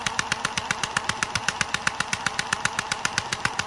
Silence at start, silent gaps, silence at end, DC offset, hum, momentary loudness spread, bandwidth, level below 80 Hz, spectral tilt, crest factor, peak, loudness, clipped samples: 0 s; none; 0 s; under 0.1%; none; 1 LU; 11.5 kHz; -52 dBFS; -1.5 dB/octave; 24 dB; -4 dBFS; -26 LUFS; under 0.1%